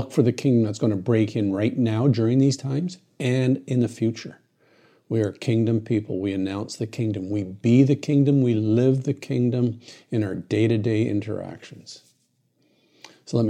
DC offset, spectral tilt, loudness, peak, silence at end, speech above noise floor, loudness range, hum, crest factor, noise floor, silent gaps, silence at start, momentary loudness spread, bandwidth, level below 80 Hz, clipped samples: under 0.1%; -7.5 dB/octave; -23 LUFS; -6 dBFS; 0 s; 46 dB; 5 LU; none; 18 dB; -68 dBFS; none; 0 s; 11 LU; 10.5 kHz; -68 dBFS; under 0.1%